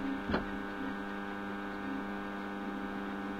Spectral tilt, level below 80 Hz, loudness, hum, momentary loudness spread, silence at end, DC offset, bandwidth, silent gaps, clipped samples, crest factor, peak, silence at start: -6.5 dB/octave; -56 dBFS; -39 LUFS; none; 4 LU; 0 s; under 0.1%; 16 kHz; none; under 0.1%; 20 dB; -18 dBFS; 0 s